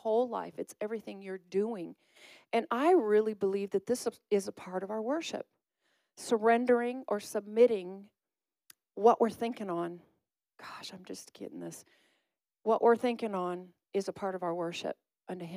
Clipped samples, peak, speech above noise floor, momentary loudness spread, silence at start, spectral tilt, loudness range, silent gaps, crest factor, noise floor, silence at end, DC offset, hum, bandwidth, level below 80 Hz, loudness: under 0.1%; -12 dBFS; over 58 dB; 19 LU; 0.05 s; -5 dB/octave; 4 LU; none; 20 dB; under -90 dBFS; 0 s; under 0.1%; none; 15.5 kHz; -84 dBFS; -31 LUFS